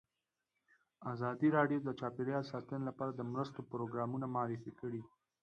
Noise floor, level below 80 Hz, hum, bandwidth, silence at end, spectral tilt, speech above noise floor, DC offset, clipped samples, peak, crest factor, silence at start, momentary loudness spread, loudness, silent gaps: -90 dBFS; -78 dBFS; none; 7.6 kHz; 0.35 s; -8.5 dB/octave; 51 dB; under 0.1%; under 0.1%; -18 dBFS; 20 dB; 1 s; 12 LU; -39 LUFS; none